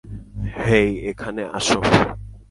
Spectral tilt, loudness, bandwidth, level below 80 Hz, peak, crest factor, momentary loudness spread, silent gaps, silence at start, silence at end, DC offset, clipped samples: -5 dB/octave; -20 LUFS; 11.5 kHz; -38 dBFS; 0 dBFS; 20 dB; 14 LU; none; 0.05 s; 0.1 s; under 0.1%; under 0.1%